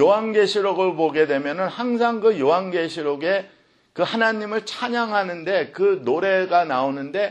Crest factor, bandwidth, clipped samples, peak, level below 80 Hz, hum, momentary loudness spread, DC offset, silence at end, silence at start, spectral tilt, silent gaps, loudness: 16 dB; 9.6 kHz; under 0.1%; -4 dBFS; -72 dBFS; none; 7 LU; under 0.1%; 0 s; 0 s; -5 dB/octave; none; -21 LUFS